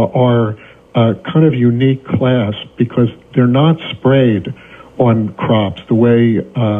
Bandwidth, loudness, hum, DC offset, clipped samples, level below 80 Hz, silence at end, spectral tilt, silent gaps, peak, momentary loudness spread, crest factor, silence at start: 3.8 kHz; -13 LUFS; none; under 0.1%; under 0.1%; -50 dBFS; 0 s; -10 dB/octave; none; 0 dBFS; 8 LU; 12 dB; 0 s